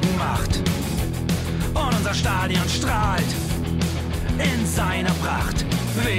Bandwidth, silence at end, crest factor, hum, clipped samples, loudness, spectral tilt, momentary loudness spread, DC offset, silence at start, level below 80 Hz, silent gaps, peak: 16 kHz; 0 s; 12 dB; none; under 0.1%; -23 LUFS; -5 dB/octave; 3 LU; under 0.1%; 0 s; -30 dBFS; none; -10 dBFS